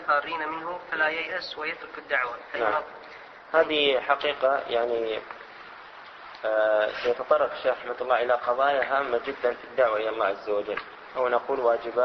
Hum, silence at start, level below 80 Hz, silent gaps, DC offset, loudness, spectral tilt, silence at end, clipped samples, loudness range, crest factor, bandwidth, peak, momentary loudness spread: none; 0 s; -64 dBFS; none; under 0.1%; -26 LUFS; -4.5 dB/octave; 0 s; under 0.1%; 3 LU; 20 dB; 6.2 kHz; -8 dBFS; 18 LU